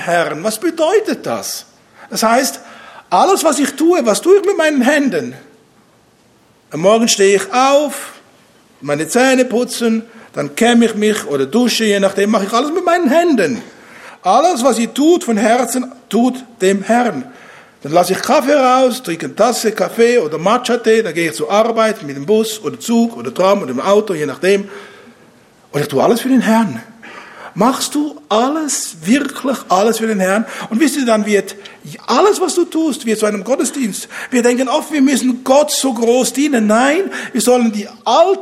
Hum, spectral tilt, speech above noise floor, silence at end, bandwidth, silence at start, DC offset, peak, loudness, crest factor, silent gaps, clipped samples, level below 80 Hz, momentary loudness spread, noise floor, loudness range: none; -4 dB/octave; 37 dB; 0 s; 16 kHz; 0 s; under 0.1%; 0 dBFS; -14 LUFS; 14 dB; none; under 0.1%; -64 dBFS; 10 LU; -51 dBFS; 3 LU